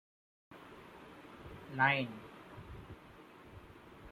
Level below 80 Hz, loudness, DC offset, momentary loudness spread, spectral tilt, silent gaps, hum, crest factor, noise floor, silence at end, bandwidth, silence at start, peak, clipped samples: -64 dBFS; -33 LUFS; under 0.1%; 25 LU; -6 dB/octave; none; none; 26 dB; -57 dBFS; 0 s; 16 kHz; 0.5 s; -16 dBFS; under 0.1%